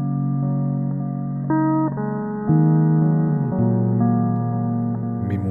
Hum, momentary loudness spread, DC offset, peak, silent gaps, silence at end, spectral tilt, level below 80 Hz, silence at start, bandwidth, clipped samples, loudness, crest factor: none; 8 LU; 0.1%; -6 dBFS; none; 0 s; -13.5 dB/octave; -54 dBFS; 0 s; 2.3 kHz; under 0.1%; -21 LUFS; 14 dB